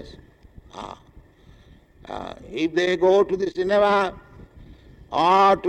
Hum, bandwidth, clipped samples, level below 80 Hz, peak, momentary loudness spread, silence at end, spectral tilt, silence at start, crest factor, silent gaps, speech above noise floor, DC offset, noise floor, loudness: none; 9.2 kHz; under 0.1%; -50 dBFS; -8 dBFS; 20 LU; 0 s; -5.5 dB/octave; 0 s; 16 dB; none; 30 dB; under 0.1%; -51 dBFS; -20 LUFS